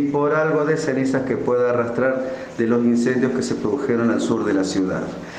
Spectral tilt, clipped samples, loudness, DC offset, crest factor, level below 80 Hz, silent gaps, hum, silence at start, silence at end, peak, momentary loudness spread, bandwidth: -6 dB/octave; under 0.1%; -20 LUFS; under 0.1%; 14 dB; -54 dBFS; none; none; 0 s; 0 s; -6 dBFS; 5 LU; 9.6 kHz